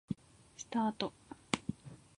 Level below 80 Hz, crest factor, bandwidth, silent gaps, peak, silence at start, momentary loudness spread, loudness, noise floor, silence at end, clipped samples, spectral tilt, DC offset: -68 dBFS; 30 dB; 11 kHz; none; -12 dBFS; 0.1 s; 19 LU; -39 LUFS; -55 dBFS; 0.2 s; under 0.1%; -4.5 dB/octave; under 0.1%